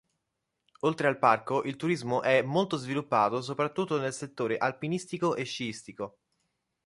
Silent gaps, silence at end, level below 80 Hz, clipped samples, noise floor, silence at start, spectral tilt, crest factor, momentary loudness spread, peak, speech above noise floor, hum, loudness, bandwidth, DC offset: none; 0.8 s; -72 dBFS; under 0.1%; -83 dBFS; 0.85 s; -5.5 dB/octave; 22 dB; 10 LU; -8 dBFS; 54 dB; none; -29 LUFS; 11.5 kHz; under 0.1%